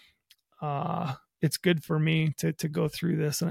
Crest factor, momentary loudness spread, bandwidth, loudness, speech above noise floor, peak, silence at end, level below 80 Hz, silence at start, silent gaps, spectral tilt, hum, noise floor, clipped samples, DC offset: 18 dB; 8 LU; 16 kHz; -29 LUFS; 37 dB; -10 dBFS; 0 s; -64 dBFS; 0.6 s; none; -5.5 dB/octave; none; -65 dBFS; under 0.1%; under 0.1%